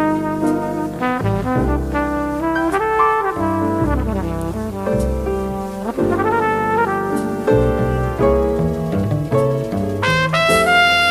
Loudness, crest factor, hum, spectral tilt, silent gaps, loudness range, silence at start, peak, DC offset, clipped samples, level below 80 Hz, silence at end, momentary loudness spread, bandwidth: -18 LUFS; 16 dB; none; -6 dB/octave; none; 3 LU; 0 s; -2 dBFS; under 0.1%; under 0.1%; -30 dBFS; 0 s; 7 LU; 15.5 kHz